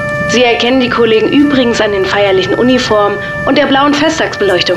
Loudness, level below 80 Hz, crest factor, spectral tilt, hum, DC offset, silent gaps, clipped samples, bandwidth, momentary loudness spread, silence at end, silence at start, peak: -10 LUFS; -38 dBFS; 10 dB; -4.5 dB/octave; none; under 0.1%; none; under 0.1%; 12 kHz; 3 LU; 0 s; 0 s; 0 dBFS